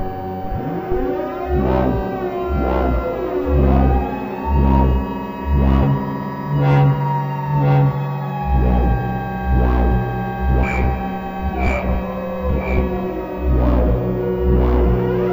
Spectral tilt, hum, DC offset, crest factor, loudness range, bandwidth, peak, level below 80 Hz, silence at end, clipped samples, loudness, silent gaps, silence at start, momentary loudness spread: -9.5 dB/octave; none; under 0.1%; 14 dB; 3 LU; 16 kHz; -4 dBFS; -22 dBFS; 0 s; under 0.1%; -19 LUFS; none; 0 s; 9 LU